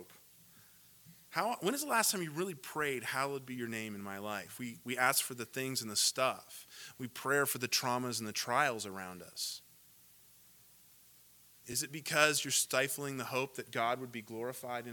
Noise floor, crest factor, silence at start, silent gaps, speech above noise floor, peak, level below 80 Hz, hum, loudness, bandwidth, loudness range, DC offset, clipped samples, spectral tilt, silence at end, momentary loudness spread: -62 dBFS; 28 dB; 0 s; none; 26 dB; -10 dBFS; -80 dBFS; none; -35 LUFS; 19 kHz; 5 LU; under 0.1%; under 0.1%; -2 dB/octave; 0 s; 14 LU